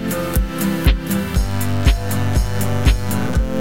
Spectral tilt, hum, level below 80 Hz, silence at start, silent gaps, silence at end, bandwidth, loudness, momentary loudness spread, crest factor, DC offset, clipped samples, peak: -5.5 dB/octave; none; -20 dBFS; 0 s; none; 0 s; 17 kHz; -19 LUFS; 3 LU; 16 dB; under 0.1%; under 0.1%; -2 dBFS